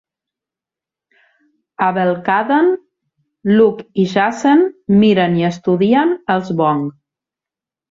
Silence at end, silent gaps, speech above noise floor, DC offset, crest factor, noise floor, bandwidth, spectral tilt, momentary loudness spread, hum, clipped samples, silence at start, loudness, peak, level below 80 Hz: 1 s; none; 74 dB; under 0.1%; 14 dB; -88 dBFS; 7.6 kHz; -7 dB/octave; 6 LU; none; under 0.1%; 1.8 s; -15 LUFS; -2 dBFS; -56 dBFS